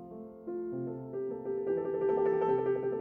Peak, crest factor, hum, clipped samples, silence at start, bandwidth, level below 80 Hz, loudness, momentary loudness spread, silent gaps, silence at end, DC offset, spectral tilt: -20 dBFS; 14 dB; none; under 0.1%; 0 s; 3.3 kHz; -70 dBFS; -33 LUFS; 11 LU; none; 0 s; under 0.1%; -10.5 dB/octave